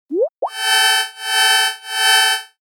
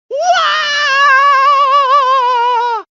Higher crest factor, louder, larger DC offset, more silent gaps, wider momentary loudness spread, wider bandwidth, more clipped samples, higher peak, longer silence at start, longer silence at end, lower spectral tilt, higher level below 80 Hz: about the same, 14 dB vs 10 dB; second, -14 LUFS vs -10 LUFS; neither; first, 0.32-0.36 s vs none; first, 9 LU vs 5 LU; first, over 20 kHz vs 7.6 kHz; neither; about the same, -2 dBFS vs 0 dBFS; about the same, 0.1 s vs 0.1 s; about the same, 0.15 s vs 0.1 s; first, 4 dB/octave vs 5.5 dB/octave; second, -90 dBFS vs -62 dBFS